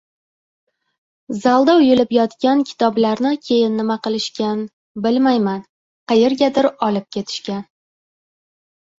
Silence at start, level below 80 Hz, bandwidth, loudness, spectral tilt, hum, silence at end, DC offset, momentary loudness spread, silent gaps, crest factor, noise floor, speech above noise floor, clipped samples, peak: 1.3 s; -62 dBFS; 7.8 kHz; -17 LUFS; -5.5 dB/octave; none; 1.4 s; under 0.1%; 12 LU; 4.73-4.95 s, 5.69-6.07 s; 16 dB; under -90 dBFS; over 74 dB; under 0.1%; -2 dBFS